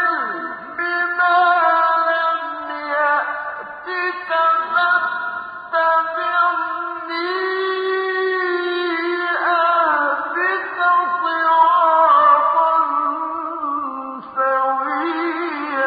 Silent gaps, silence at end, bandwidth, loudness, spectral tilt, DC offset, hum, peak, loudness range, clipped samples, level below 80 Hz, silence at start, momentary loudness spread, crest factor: none; 0 s; 5 kHz; -18 LUFS; -5 dB/octave; under 0.1%; none; -2 dBFS; 5 LU; under 0.1%; -68 dBFS; 0 s; 11 LU; 16 dB